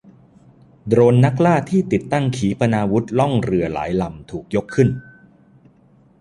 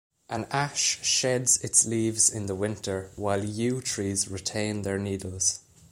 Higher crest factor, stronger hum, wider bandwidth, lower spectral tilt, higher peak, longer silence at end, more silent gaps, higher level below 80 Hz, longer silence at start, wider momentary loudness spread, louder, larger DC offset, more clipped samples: about the same, 18 dB vs 22 dB; neither; second, 11 kHz vs 16 kHz; first, -8 dB/octave vs -3 dB/octave; first, -2 dBFS vs -6 dBFS; first, 1.2 s vs 0.3 s; neither; first, -46 dBFS vs -60 dBFS; first, 0.85 s vs 0.3 s; about the same, 10 LU vs 11 LU; first, -18 LUFS vs -26 LUFS; neither; neither